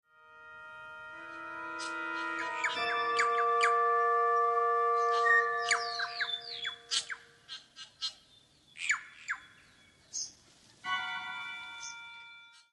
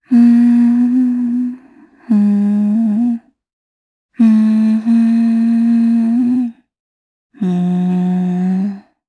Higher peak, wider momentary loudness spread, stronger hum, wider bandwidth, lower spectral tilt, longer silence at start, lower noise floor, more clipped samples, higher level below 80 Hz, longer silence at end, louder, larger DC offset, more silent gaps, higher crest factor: second, -14 dBFS vs -2 dBFS; first, 20 LU vs 9 LU; neither; first, 11.5 kHz vs 4.7 kHz; second, 0 dB/octave vs -9.5 dB/octave; first, 0.3 s vs 0.1 s; first, -63 dBFS vs -44 dBFS; neither; second, -78 dBFS vs -66 dBFS; about the same, 0.25 s vs 0.3 s; second, -31 LUFS vs -13 LUFS; neither; second, none vs 3.53-4.09 s, 6.80-7.30 s; first, 20 dB vs 12 dB